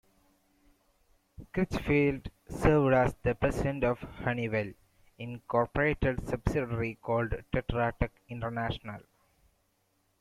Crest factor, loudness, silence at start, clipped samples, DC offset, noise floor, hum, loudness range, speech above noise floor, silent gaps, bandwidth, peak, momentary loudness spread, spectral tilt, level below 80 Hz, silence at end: 20 dB; -31 LUFS; 1.4 s; under 0.1%; under 0.1%; -74 dBFS; none; 5 LU; 44 dB; none; 15 kHz; -12 dBFS; 14 LU; -7.5 dB/octave; -44 dBFS; 1.2 s